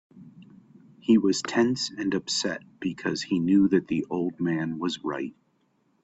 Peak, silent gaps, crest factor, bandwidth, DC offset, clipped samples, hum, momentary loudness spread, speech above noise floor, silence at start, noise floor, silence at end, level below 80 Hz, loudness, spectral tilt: -8 dBFS; none; 18 dB; 8.4 kHz; under 0.1%; under 0.1%; none; 11 LU; 43 dB; 0.15 s; -69 dBFS; 0.7 s; -64 dBFS; -26 LUFS; -5 dB/octave